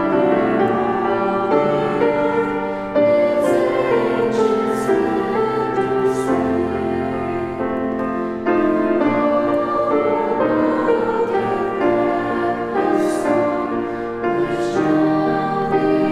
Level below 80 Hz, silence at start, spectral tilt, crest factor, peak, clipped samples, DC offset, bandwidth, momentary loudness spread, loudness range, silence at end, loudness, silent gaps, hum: -48 dBFS; 0 s; -7 dB/octave; 14 dB; -4 dBFS; under 0.1%; under 0.1%; 13 kHz; 5 LU; 2 LU; 0 s; -18 LUFS; none; none